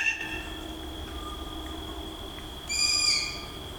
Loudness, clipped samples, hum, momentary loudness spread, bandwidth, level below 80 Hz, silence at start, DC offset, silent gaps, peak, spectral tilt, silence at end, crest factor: -29 LUFS; under 0.1%; none; 16 LU; 19.5 kHz; -44 dBFS; 0 s; under 0.1%; none; -14 dBFS; -1 dB/octave; 0 s; 18 dB